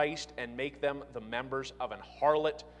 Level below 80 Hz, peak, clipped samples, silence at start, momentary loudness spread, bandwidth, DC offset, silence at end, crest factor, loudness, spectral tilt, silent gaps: -60 dBFS; -16 dBFS; under 0.1%; 0 s; 11 LU; 10 kHz; under 0.1%; 0 s; 20 dB; -34 LUFS; -4.5 dB/octave; none